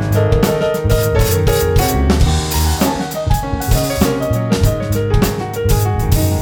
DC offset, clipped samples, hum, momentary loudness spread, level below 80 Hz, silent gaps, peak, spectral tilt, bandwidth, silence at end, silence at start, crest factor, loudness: under 0.1%; under 0.1%; none; 4 LU; -20 dBFS; none; -2 dBFS; -5.5 dB/octave; over 20 kHz; 0 s; 0 s; 12 dB; -15 LUFS